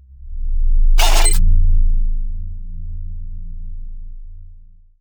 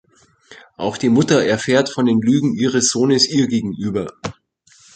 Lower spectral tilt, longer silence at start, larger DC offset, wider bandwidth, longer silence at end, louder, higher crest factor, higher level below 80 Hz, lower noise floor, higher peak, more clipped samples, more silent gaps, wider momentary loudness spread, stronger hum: second, -2.5 dB/octave vs -4.5 dB/octave; second, 0.2 s vs 0.5 s; neither; first, over 20 kHz vs 9.2 kHz; second, 0.45 s vs 0.65 s; second, -20 LUFS vs -17 LUFS; about the same, 14 dB vs 16 dB; first, -14 dBFS vs -54 dBFS; second, -41 dBFS vs -53 dBFS; about the same, -2 dBFS vs -2 dBFS; neither; neither; first, 22 LU vs 11 LU; neither